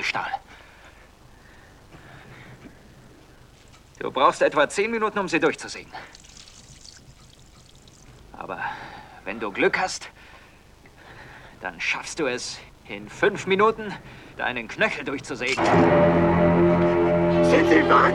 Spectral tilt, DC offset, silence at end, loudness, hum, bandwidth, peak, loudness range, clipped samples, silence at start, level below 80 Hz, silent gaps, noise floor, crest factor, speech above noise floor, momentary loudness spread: -5.5 dB/octave; under 0.1%; 0 s; -22 LUFS; none; 11.5 kHz; -4 dBFS; 17 LU; under 0.1%; 0 s; -50 dBFS; none; -51 dBFS; 20 dB; 28 dB; 24 LU